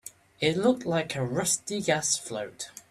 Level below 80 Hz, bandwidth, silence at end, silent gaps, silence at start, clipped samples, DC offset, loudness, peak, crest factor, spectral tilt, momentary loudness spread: -64 dBFS; 15 kHz; 0.1 s; none; 0.05 s; under 0.1%; under 0.1%; -27 LUFS; -8 dBFS; 20 dB; -3.5 dB/octave; 12 LU